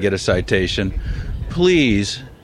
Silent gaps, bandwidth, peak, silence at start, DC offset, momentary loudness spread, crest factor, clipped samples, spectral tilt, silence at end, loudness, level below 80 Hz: none; 12 kHz; -2 dBFS; 0 s; under 0.1%; 13 LU; 16 dB; under 0.1%; -5.5 dB/octave; 0.1 s; -18 LUFS; -28 dBFS